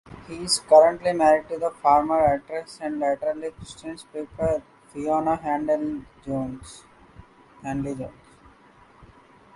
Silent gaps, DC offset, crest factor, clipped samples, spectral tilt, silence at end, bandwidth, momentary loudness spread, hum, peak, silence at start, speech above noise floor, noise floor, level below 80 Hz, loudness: none; under 0.1%; 20 dB; under 0.1%; -4.5 dB/octave; 1.45 s; 11.5 kHz; 19 LU; none; -4 dBFS; 0.1 s; 30 dB; -53 dBFS; -52 dBFS; -23 LUFS